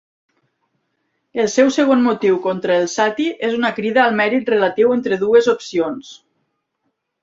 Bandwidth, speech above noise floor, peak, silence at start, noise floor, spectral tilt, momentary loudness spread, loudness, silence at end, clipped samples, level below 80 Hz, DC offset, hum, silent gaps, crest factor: 7.8 kHz; 56 dB; -2 dBFS; 1.35 s; -72 dBFS; -4.5 dB/octave; 7 LU; -16 LUFS; 1.05 s; under 0.1%; -62 dBFS; under 0.1%; none; none; 16 dB